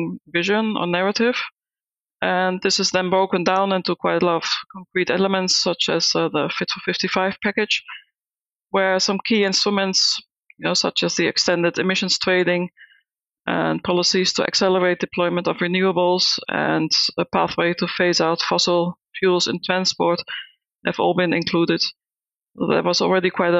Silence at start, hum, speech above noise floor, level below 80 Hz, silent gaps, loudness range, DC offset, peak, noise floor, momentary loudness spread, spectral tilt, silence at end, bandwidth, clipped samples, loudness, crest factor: 0 s; none; over 70 dB; -62 dBFS; none; 2 LU; under 0.1%; -2 dBFS; under -90 dBFS; 7 LU; -3.5 dB/octave; 0 s; 8.2 kHz; under 0.1%; -19 LUFS; 18 dB